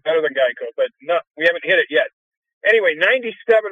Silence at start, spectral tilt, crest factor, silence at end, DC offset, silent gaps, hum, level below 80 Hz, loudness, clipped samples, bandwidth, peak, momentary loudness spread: 0.05 s; -4 dB/octave; 16 dB; 0 s; under 0.1%; 2.13-2.42 s, 2.53-2.61 s; none; -72 dBFS; -18 LUFS; under 0.1%; 10 kHz; -2 dBFS; 8 LU